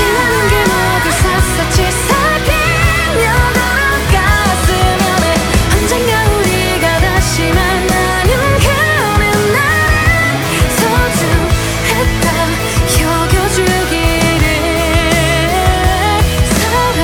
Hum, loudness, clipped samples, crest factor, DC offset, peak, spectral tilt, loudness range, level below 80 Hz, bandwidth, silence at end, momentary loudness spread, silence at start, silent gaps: none; -11 LUFS; under 0.1%; 12 dB; under 0.1%; 0 dBFS; -4 dB/octave; 1 LU; -18 dBFS; 18 kHz; 0 s; 2 LU; 0 s; none